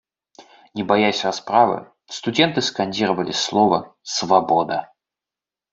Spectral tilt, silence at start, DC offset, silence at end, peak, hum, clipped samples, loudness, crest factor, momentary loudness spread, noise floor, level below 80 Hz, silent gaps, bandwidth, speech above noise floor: -4 dB/octave; 0.4 s; under 0.1%; 0.9 s; 0 dBFS; none; under 0.1%; -20 LUFS; 20 dB; 11 LU; -89 dBFS; -62 dBFS; none; 8 kHz; 70 dB